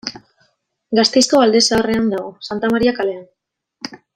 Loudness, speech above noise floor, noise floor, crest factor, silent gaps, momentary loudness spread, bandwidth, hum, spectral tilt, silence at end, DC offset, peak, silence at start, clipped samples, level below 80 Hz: -15 LUFS; 47 dB; -63 dBFS; 16 dB; none; 20 LU; 15 kHz; none; -3 dB/octave; 0.2 s; under 0.1%; 0 dBFS; 0.05 s; under 0.1%; -50 dBFS